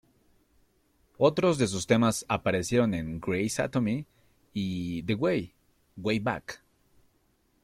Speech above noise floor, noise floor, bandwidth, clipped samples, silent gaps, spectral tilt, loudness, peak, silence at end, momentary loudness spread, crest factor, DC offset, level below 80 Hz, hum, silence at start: 42 dB; -69 dBFS; 14 kHz; under 0.1%; none; -5.5 dB/octave; -28 LUFS; -10 dBFS; 1.05 s; 11 LU; 20 dB; under 0.1%; -58 dBFS; none; 1.2 s